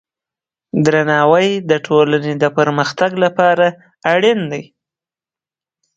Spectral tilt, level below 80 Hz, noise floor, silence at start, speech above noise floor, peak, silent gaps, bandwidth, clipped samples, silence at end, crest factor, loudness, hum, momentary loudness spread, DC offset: -6 dB/octave; -60 dBFS; under -90 dBFS; 0.75 s; over 76 dB; 0 dBFS; none; 7.8 kHz; under 0.1%; 1.35 s; 16 dB; -14 LUFS; none; 7 LU; under 0.1%